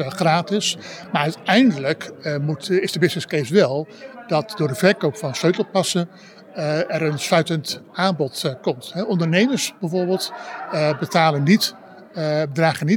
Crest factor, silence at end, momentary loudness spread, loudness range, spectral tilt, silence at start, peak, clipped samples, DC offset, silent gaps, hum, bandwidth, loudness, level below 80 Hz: 18 dB; 0 s; 10 LU; 2 LU; -5 dB/octave; 0 s; -2 dBFS; under 0.1%; under 0.1%; none; none; 18 kHz; -20 LUFS; -72 dBFS